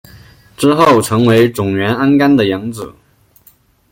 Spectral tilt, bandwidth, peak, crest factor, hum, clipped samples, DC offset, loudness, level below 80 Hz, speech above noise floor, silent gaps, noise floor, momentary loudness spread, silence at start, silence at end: -6 dB/octave; 17 kHz; 0 dBFS; 12 dB; none; under 0.1%; under 0.1%; -12 LUFS; -48 dBFS; 38 dB; none; -49 dBFS; 13 LU; 0.6 s; 1.05 s